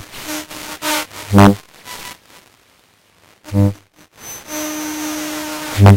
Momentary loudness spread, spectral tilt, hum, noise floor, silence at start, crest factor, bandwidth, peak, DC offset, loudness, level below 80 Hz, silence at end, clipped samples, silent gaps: 22 LU; -5.5 dB/octave; none; -53 dBFS; 0 s; 18 dB; 17 kHz; 0 dBFS; under 0.1%; -17 LUFS; -44 dBFS; 0 s; 0.2%; none